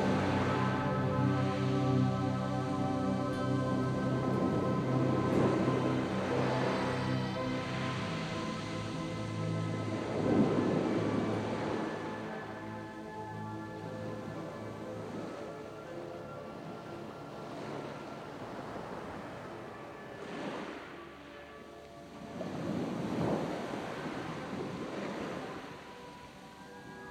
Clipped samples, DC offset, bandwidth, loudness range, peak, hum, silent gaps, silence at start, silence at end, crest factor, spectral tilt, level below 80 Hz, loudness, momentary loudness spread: under 0.1%; under 0.1%; 11.5 kHz; 12 LU; -18 dBFS; none; none; 0 s; 0 s; 18 dB; -7 dB/octave; -60 dBFS; -35 LUFS; 15 LU